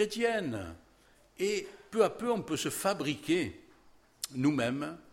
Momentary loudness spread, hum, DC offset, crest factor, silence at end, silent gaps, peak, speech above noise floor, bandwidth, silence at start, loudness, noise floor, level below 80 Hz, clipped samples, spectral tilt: 10 LU; none; under 0.1%; 20 dB; 0.1 s; none; -14 dBFS; 31 dB; 16.5 kHz; 0 s; -32 LUFS; -63 dBFS; -64 dBFS; under 0.1%; -4.5 dB/octave